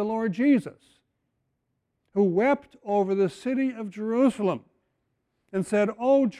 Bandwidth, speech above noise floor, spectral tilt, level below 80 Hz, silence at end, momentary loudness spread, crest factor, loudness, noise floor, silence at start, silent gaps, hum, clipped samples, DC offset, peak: 11.5 kHz; 53 dB; -7.5 dB/octave; -70 dBFS; 0 s; 10 LU; 14 dB; -25 LUFS; -78 dBFS; 0 s; none; none; under 0.1%; under 0.1%; -12 dBFS